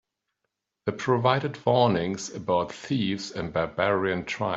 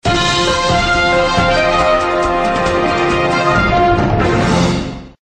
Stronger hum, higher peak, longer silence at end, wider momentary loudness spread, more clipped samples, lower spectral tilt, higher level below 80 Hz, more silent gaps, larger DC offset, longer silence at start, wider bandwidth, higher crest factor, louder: neither; second, -6 dBFS vs 0 dBFS; about the same, 0 s vs 0.1 s; first, 9 LU vs 3 LU; neither; about the same, -5.5 dB/octave vs -5 dB/octave; second, -60 dBFS vs -28 dBFS; neither; neither; first, 0.85 s vs 0.05 s; second, 8 kHz vs 10 kHz; first, 20 dB vs 12 dB; second, -26 LUFS vs -13 LUFS